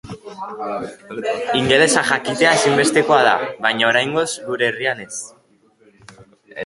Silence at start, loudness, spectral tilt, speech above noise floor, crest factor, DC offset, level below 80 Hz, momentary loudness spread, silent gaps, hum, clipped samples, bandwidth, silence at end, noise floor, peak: 0.05 s; -17 LUFS; -3 dB/octave; 37 dB; 18 dB; under 0.1%; -56 dBFS; 17 LU; none; none; under 0.1%; 11.5 kHz; 0 s; -55 dBFS; 0 dBFS